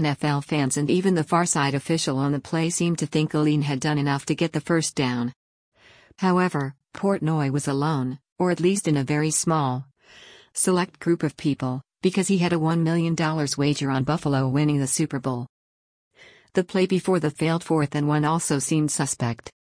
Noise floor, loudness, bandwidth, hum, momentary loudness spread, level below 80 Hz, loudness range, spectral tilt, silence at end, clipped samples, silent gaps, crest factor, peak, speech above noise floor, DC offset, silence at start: -50 dBFS; -23 LUFS; 10.5 kHz; none; 6 LU; -60 dBFS; 3 LU; -5 dB/octave; 0.3 s; under 0.1%; 5.36-5.72 s, 8.32-8.36 s, 15.49-16.11 s; 16 dB; -8 dBFS; 27 dB; under 0.1%; 0 s